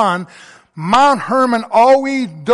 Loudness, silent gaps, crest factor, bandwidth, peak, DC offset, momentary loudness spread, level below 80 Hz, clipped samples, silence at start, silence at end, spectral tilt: -13 LUFS; none; 12 dB; 11.5 kHz; -2 dBFS; under 0.1%; 13 LU; -54 dBFS; under 0.1%; 0 s; 0 s; -5 dB/octave